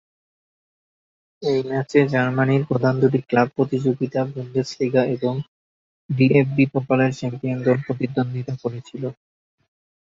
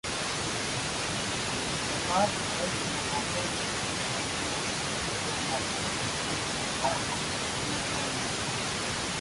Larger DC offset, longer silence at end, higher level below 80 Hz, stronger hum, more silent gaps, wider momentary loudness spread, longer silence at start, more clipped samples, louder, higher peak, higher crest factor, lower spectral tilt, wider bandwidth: neither; first, 0.95 s vs 0 s; second, -60 dBFS vs -50 dBFS; neither; first, 5.48-6.09 s vs none; first, 11 LU vs 2 LU; first, 1.4 s vs 0.05 s; neither; first, -21 LUFS vs -30 LUFS; first, -2 dBFS vs -14 dBFS; about the same, 20 dB vs 16 dB; first, -8 dB/octave vs -2.5 dB/octave; second, 7.6 kHz vs 12 kHz